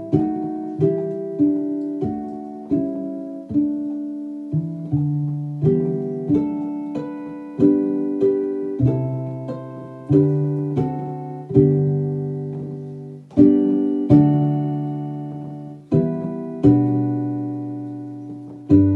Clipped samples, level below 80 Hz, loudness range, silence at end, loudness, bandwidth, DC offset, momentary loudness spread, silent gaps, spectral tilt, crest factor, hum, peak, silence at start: under 0.1%; -50 dBFS; 5 LU; 0 s; -21 LUFS; 4 kHz; under 0.1%; 15 LU; none; -12 dB/octave; 20 dB; none; 0 dBFS; 0 s